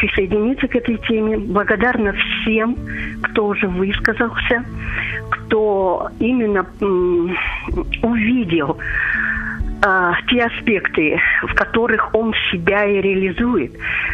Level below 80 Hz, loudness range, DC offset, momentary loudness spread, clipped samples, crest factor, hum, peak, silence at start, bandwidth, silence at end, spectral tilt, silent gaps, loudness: -32 dBFS; 3 LU; under 0.1%; 6 LU; under 0.1%; 18 dB; none; 0 dBFS; 0 s; 7.8 kHz; 0 s; -7 dB/octave; none; -17 LUFS